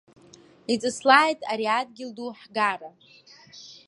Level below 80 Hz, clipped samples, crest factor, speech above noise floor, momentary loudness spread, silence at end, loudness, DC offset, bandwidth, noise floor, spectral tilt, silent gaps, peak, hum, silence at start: -74 dBFS; under 0.1%; 24 dB; 28 dB; 20 LU; 0.15 s; -23 LUFS; under 0.1%; 11.5 kHz; -53 dBFS; -2.5 dB/octave; none; -2 dBFS; none; 0.7 s